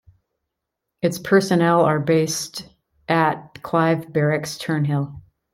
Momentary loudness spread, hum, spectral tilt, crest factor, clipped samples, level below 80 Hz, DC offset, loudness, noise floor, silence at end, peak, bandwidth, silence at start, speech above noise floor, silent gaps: 13 LU; none; -5.5 dB/octave; 18 dB; under 0.1%; -58 dBFS; under 0.1%; -20 LUFS; -81 dBFS; 0.35 s; -4 dBFS; 16 kHz; 1.05 s; 62 dB; none